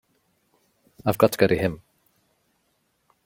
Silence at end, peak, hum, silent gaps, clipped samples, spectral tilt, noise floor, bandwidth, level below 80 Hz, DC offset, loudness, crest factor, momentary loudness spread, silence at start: 1.5 s; -2 dBFS; none; none; under 0.1%; -6 dB/octave; -70 dBFS; 16.5 kHz; -56 dBFS; under 0.1%; -22 LUFS; 24 dB; 10 LU; 1.05 s